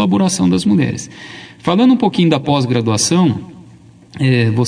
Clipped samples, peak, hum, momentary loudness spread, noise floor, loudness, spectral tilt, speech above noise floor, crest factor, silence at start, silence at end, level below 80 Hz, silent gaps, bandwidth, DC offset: under 0.1%; 0 dBFS; none; 14 LU; -42 dBFS; -14 LUFS; -5.5 dB/octave; 28 dB; 14 dB; 0 s; 0 s; -50 dBFS; none; 10.5 kHz; under 0.1%